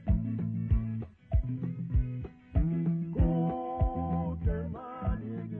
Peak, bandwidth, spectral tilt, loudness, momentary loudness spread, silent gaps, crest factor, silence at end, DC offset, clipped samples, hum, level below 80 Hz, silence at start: -14 dBFS; 3.4 kHz; -12.5 dB/octave; -32 LUFS; 7 LU; none; 16 dB; 0 s; under 0.1%; under 0.1%; none; -36 dBFS; 0 s